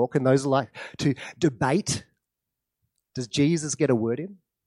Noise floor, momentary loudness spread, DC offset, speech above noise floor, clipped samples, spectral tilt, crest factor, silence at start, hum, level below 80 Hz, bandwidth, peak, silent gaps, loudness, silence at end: -85 dBFS; 13 LU; under 0.1%; 60 dB; under 0.1%; -5.5 dB/octave; 18 dB; 0 s; none; -62 dBFS; 12 kHz; -8 dBFS; none; -25 LUFS; 0.35 s